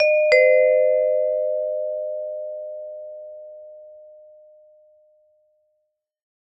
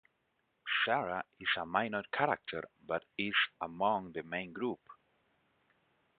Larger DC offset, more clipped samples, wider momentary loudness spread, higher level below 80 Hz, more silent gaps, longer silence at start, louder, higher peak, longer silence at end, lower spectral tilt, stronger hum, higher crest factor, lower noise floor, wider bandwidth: neither; neither; first, 24 LU vs 9 LU; about the same, -72 dBFS vs -74 dBFS; neither; second, 0 s vs 0.65 s; first, -19 LUFS vs -35 LUFS; first, -4 dBFS vs -14 dBFS; first, 2.45 s vs 1.25 s; about the same, -1 dB/octave vs -1 dB/octave; neither; about the same, 20 dB vs 24 dB; second, -75 dBFS vs -79 dBFS; first, 7.8 kHz vs 4.8 kHz